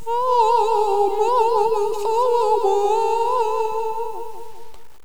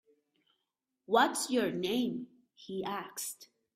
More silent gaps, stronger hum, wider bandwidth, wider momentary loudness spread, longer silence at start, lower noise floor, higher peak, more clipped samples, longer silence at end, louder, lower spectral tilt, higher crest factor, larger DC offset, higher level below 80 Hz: neither; neither; first, over 20 kHz vs 16 kHz; second, 11 LU vs 15 LU; second, 0.05 s vs 1.1 s; second, -40 dBFS vs -86 dBFS; first, -6 dBFS vs -12 dBFS; neither; second, 0 s vs 0.3 s; first, -19 LUFS vs -33 LUFS; about the same, -3.5 dB/octave vs -3 dB/octave; second, 12 dB vs 22 dB; first, 4% vs under 0.1%; first, -60 dBFS vs -76 dBFS